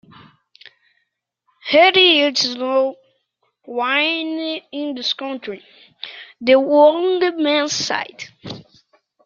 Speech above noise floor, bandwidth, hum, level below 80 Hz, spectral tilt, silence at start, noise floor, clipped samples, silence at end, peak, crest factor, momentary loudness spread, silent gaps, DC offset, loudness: 55 dB; 7.4 kHz; none; -70 dBFS; -2.5 dB/octave; 1.65 s; -73 dBFS; under 0.1%; 0.65 s; -2 dBFS; 18 dB; 22 LU; none; under 0.1%; -16 LUFS